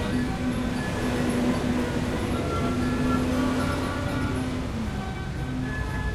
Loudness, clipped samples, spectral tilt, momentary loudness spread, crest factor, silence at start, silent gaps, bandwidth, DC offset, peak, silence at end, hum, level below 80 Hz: -27 LUFS; under 0.1%; -6 dB/octave; 6 LU; 14 dB; 0 s; none; 14.5 kHz; under 0.1%; -12 dBFS; 0 s; none; -36 dBFS